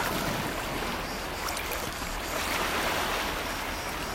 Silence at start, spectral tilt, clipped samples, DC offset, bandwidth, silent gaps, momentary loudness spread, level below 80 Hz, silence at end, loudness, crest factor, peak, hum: 0 s; -3 dB/octave; under 0.1%; under 0.1%; 16 kHz; none; 5 LU; -42 dBFS; 0 s; -30 LUFS; 16 dB; -14 dBFS; none